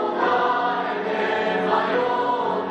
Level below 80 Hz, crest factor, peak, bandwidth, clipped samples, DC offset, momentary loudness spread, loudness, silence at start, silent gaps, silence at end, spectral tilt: -66 dBFS; 14 dB; -8 dBFS; 8.6 kHz; under 0.1%; under 0.1%; 3 LU; -22 LUFS; 0 s; none; 0 s; -5.5 dB/octave